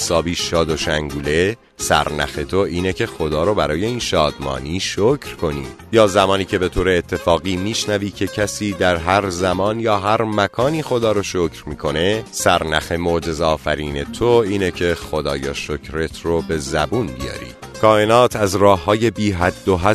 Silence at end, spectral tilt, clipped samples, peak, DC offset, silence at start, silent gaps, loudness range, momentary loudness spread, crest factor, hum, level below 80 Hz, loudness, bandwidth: 0 s; -4.5 dB/octave; under 0.1%; 0 dBFS; under 0.1%; 0 s; none; 3 LU; 9 LU; 18 dB; none; -36 dBFS; -18 LUFS; 13.5 kHz